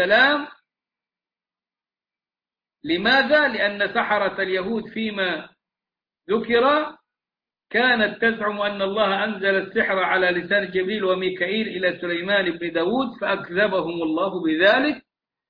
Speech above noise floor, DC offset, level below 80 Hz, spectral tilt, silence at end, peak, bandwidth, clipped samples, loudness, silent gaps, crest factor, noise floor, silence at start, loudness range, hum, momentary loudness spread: over 69 dB; under 0.1%; -60 dBFS; -6.5 dB/octave; 0.5 s; -4 dBFS; 5.2 kHz; under 0.1%; -21 LUFS; none; 18 dB; under -90 dBFS; 0 s; 3 LU; none; 9 LU